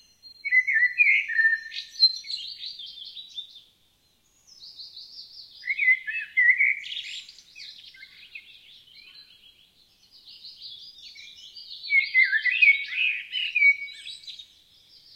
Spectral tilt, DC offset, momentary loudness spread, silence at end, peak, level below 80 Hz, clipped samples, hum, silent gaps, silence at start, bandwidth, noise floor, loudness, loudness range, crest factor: 3 dB/octave; under 0.1%; 24 LU; 0.7 s; -8 dBFS; -76 dBFS; under 0.1%; none; none; 0.25 s; 15 kHz; -65 dBFS; -21 LUFS; 23 LU; 20 dB